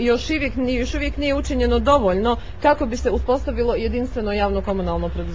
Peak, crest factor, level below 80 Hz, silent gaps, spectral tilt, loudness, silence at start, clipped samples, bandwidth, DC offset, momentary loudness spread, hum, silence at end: -2 dBFS; 18 dB; -28 dBFS; none; -6 dB/octave; -21 LUFS; 0 s; under 0.1%; 7.8 kHz; 2%; 7 LU; none; 0 s